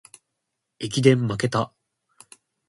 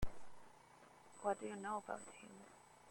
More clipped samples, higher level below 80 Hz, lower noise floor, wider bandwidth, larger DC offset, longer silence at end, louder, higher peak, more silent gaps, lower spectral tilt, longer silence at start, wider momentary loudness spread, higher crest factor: neither; about the same, -60 dBFS vs -58 dBFS; first, -80 dBFS vs -65 dBFS; second, 11.5 kHz vs 16.5 kHz; neither; first, 1 s vs 0 s; first, -22 LUFS vs -47 LUFS; first, -2 dBFS vs -26 dBFS; neither; about the same, -6 dB/octave vs -5 dB/octave; first, 0.8 s vs 0 s; second, 14 LU vs 21 LU; about the same, 24 dB vs 20 dB